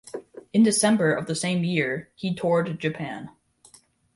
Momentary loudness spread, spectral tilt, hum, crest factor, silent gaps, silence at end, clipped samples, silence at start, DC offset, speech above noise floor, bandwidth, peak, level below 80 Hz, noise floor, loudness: 18 LU; -5 dB/octave; none; 16 dB; none; 0.85 s; under 0.1%; 0.05 s; under 0.1%; 33 dB; 11.5 kHz; -8 dBFS; -64 dBFS; -56 dBFS; -24 LUFS